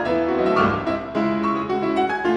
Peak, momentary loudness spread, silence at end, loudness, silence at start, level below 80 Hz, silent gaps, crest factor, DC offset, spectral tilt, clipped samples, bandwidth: -6 dBFS; 5 LU; 0 s; -21 LUFS; 0 s; -48 dBFS; none; 14 dB; under 0.1%; -7 dB/octave; under 0.1%; 9.6 kHz